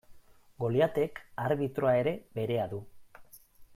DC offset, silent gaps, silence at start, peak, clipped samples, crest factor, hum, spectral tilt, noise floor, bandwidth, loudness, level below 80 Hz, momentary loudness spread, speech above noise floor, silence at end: under 0.1%; none; 0.1 s; -14 dBFS; under 0.1%; 18 dB; none; -7.5 dB/octave; -55 dBFS; 16 kHz; -31 LUFS; -64 dBFS; 9 LU; 25 dB; 0.1 s